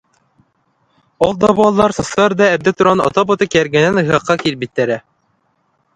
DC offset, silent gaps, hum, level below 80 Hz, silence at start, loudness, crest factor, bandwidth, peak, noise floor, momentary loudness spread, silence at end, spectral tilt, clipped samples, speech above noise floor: under 0.1%; none; none; -46 dBFS; 1.2 s; -14 LUFS; 16 dB; 11 kHz; 0 dBFS; -62 dBFS; 6 LU; 0.95 s; -5.5 dB/octave; under 0.1%; 49 dB